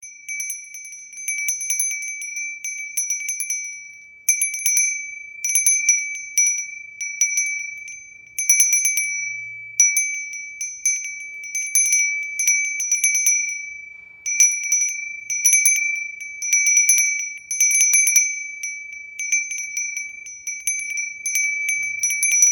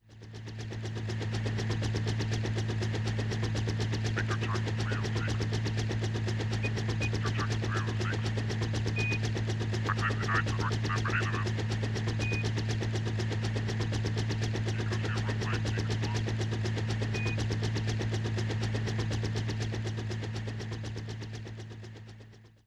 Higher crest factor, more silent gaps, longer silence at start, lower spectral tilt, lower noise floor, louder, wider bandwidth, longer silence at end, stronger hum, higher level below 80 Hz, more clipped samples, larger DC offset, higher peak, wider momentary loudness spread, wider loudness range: about the same, 20 dB vs 16 dB; neither; about the same, 0 s vs 0.1 s; second, 5 dB/octave vs -5.5 dB/octave; second, -42 dBFS vs -53 dBFS; first, -18 LUFS vs -32 LUFS; first, over 20 kHz vs 10 kHz; second, 0 s vs 0.2 s; neither; second, -72 dBFS vs -48 dBFS; neither; neither; first, -2 dBFS vs -16 dBFS; first, 16 LU vs 8 LU; first, 7 LU vs 3 LU